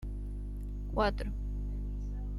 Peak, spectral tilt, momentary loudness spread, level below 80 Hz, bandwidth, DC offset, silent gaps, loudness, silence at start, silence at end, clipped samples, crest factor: -16 dBFS; -7.5 dB/octave; 10 LU; -36 dBFS; 10.5 kHz; under 0.1%; none; -37 LUFS; 0 s; 0 s; under 0.1%; 18 dB